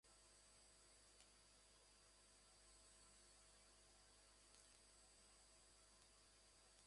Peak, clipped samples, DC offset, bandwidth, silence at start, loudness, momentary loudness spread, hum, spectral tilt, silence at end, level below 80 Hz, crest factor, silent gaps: -46 dBFS; under 0.1%; under 0.1%; 11.5 kHz; 0.05 s; -69 LUFS; 2 LU; 50 Hz at -80 dBFS; -1 dB/octave; 0 s; -80 dBFS; 26 dB; none